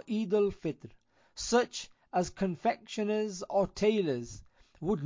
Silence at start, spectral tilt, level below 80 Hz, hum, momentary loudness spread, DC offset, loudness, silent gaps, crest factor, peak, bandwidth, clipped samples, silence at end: 0.05 s; -5 dB/octave; -58 dBFS; none; 12 LU; under 0.1%; -32 LUFS; none; 18 dB; -14 dBFS; 7.6 kHz; under 0.1%; 0 s